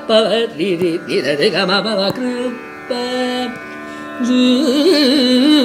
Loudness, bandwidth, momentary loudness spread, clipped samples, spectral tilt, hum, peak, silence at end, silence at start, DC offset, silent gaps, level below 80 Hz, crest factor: -15 LUFS; 15 kHz; 13 LU; under 0.1%; -4.5 dB/octave; none; 0 dBFS; 0 s; 0 s; under 0.1%; none; -60 dBFS; 14 dB